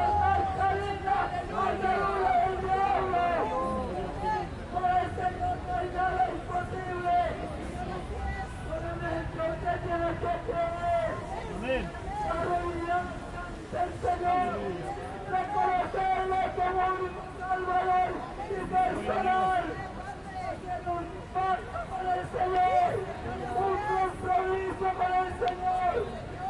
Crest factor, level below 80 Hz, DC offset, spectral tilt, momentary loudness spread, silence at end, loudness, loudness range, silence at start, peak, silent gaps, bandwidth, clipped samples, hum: 14 dB; -44 dBFS; under 0.1%; -6.5 dB/octave; 9 LU; 0 s; -30 LUFS; 4 LU; 0 s; -16 dBFS; none; 11.5 kHz; under 0.1%; none